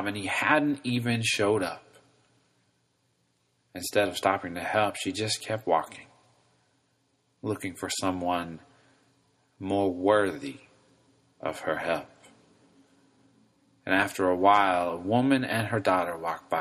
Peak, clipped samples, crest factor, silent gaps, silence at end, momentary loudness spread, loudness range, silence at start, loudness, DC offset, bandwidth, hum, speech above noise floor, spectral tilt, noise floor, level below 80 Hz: -6 dBFS; under 0.1%; 22 dB; none; 0 s; 14 LU; 9 LU; 0 s; -27 LUFS; under 0.1%; 14.5 kHz; none; 45 dB; -4.5 dB/octave; -72 dBFS; -66 dBFS